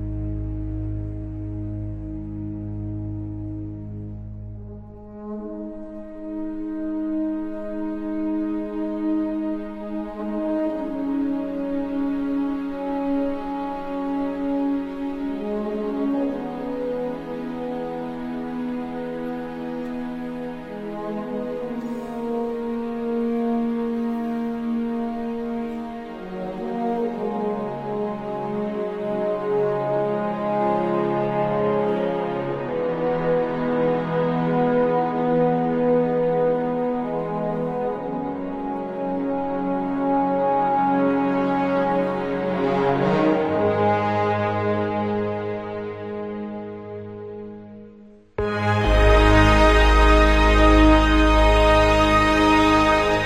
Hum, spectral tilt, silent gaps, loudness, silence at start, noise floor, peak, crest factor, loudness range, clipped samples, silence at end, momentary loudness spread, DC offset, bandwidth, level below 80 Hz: none; -7 dB/octave; none; -23 LUFS; 0 s; -46 dBFS; -2 dBFS; 20 dB; 13 LU; under 0.1%; 0 s; 15 LU; under 0.1%; 9.4 kHz; -30 dBFS